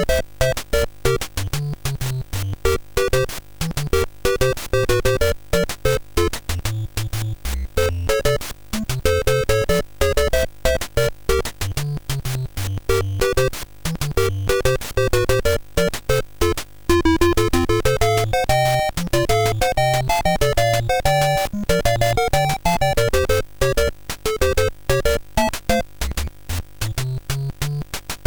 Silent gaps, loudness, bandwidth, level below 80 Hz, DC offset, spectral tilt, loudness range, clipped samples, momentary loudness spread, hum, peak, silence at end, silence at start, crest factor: none; -21 LUFS; over 20 kHz; -28 dBFS; 1%; -4.5 dB/octave; 4 LU; under 0.1%; 8 LU; none; -4 dBFS; 0.05 s; 0 s; 14 dB